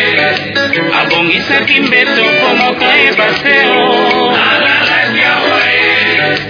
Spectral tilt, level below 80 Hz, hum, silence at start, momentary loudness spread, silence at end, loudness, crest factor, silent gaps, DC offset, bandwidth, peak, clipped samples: -4.5 dB/octave; -50 dBFS; none; 0 s; 3 LU; 0 s; -8 LUFS; 10 dB; none; under 0.1%; 5.4 kHz; 0 dBFS; 0.4%